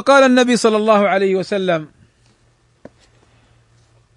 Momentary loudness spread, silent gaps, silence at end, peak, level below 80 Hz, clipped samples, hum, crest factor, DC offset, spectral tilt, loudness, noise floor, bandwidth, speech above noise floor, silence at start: 9 LU; none; 2.3 s; 0 dBFS; -62 dBFS; under 0.1%; none; 16 dB; under 0.1%; -4.5 dB/octave; -14 LUFS; -57 dBFS; 11 kHz; 43 dB; 0 s